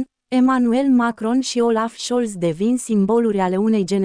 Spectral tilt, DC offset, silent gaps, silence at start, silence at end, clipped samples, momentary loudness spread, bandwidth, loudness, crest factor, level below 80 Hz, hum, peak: -5.5 dB/octave; under 0.1%; none; 0 s; 0 s; under 0.1%; 6 LU; 10.5 kHz; -19 LUFS; 12 dB; -56 dBFS; none; -6 dBFS